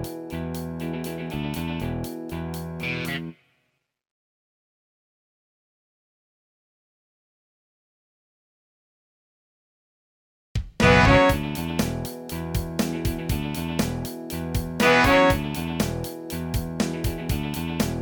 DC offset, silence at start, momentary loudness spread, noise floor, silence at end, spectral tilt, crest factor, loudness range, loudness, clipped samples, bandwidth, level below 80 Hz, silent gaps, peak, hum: under 0.1%; 0 s; 15 LU; -74 dBFS; 0 s; -5.5 dB/octave; 24 dB; 12 LU; -24 LUFS; under 0.1%; 19 kHz; -38 dBFS; 4.11-10.55 s; -4 dBFS; none